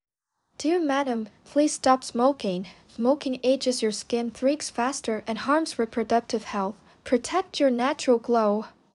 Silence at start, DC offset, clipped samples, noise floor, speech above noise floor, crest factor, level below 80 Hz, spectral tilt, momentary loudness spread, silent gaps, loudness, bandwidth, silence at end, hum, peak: 0.6 s; under 0.1%; under 0.1%; -74 dBFS; 49 dB; 20 dB; -64 dBFS; -4 dB/octave; 8 LU; none; -25 LUFS; 11.5 kHz; 0.3 s; none; -6 dBFS